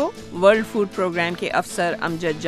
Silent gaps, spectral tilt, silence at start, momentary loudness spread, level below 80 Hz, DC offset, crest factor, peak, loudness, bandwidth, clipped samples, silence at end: none; -5 dB/octave; 0 s; 7 LU; -52 dBFS; under 0.1%; 20 dB; -2 dBFS; -21 LUFS; 15 kHz; under 0.1%; 0 s